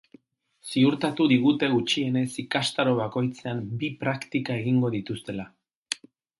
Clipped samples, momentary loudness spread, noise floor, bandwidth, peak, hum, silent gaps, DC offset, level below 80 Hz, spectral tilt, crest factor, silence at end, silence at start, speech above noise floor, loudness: under 0.1%; 13 LU; -60 dBFS; 11.5 kHz; -8 dBFS; none; 5.76-5.83 s; under 0.1%; -66 dBFS; -5.5 dB/octave; 18 dB; 0.45 s; 0.65 s; 35 dB; -26 LUFS